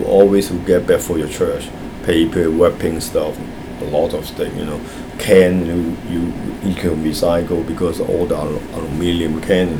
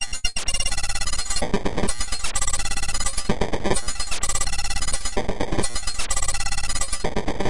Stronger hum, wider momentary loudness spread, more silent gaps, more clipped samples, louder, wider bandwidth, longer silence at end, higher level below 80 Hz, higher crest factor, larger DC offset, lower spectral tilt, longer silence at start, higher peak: neither; first, 12 LU vs 3 LU; neither; neither; first, -17 LUFS vs -25 LUFS; first, over 20 kHz vs 11.5 kHz; about the same, 0 s vs 0 s; second, -36 dBFS vs -28 dBFS; about the same, 16 dB vs 18 dB; second, under 0.1% vs 9%; first, -6 dB/octave vs -2.5 dB/octave; about the same, 0 s vs 0 s; first, 0 dBFS vs -4 dBFS